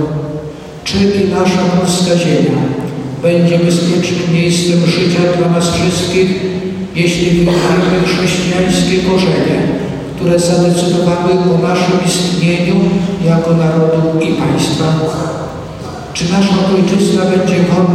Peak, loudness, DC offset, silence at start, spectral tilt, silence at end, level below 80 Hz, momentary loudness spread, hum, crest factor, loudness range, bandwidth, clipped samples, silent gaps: -2 dBFS; -12 LUFS; under 0.1%; 0 s; -5.5 dB/octave; 0 s; -38 dBFS; 8 LU; none; 10 dB; 2 LU; 14 kHz; under 0.1%; none